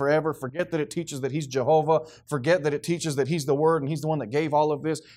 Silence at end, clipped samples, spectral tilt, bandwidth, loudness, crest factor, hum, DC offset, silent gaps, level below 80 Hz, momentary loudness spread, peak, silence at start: 0.15 s; under 0.1%; -6 dB/octave; 15.5 kHz; -25 LUFS; 16 dB; none; under 0.1%; none; -64 dBFS; 8 LU; -10 dBFS; 0 s